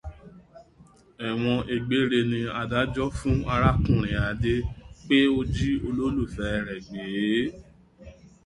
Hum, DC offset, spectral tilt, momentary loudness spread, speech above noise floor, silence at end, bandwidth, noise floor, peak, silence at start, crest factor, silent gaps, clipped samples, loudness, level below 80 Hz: none; under 0.1%; -7 dB/octave; 11 LU; 30 dB; 0.2 s; 11.5 kHz; -55 dBFS; -6 dBFS; 0.05 s; 20 dB; none; under 0.1%; -26 LUFS; -38 dBFS